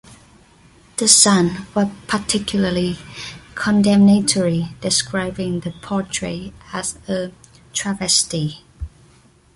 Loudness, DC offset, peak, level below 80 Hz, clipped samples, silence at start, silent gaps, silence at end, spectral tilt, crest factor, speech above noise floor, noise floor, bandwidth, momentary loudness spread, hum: -18 LUFS; under 0.1%; 0 dBFS; -44 dBFS; under 0.1%; 0.1 s; none; 0.7 s; -3.5 dB/octave; 20 dB; 33 dB; -51 dBFS; 11.5 kHz; 19 LU; none